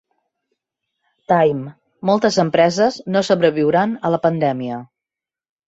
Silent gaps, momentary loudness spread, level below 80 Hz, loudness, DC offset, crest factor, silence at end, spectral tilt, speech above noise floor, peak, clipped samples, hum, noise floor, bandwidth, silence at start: none; 11 LU; -60 dBFS; -17 LUFS; under 0.1%; 18 dB; 0.8 s; -6 dB/octave; 71 dB; -2 dBFS; under 0.1%; none; -88 dBFS; 8 kHz; 1.3 s